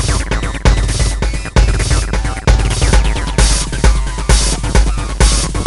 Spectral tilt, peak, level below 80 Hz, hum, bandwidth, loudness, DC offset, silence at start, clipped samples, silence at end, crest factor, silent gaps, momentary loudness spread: -4 dB/octave; 0 dBFS; -14 dBFS; none; 11.5 kHz; -14 LUFS; under 0.1%; 0 s; 0.1%; 0 s; 12 dB; none; 4 LU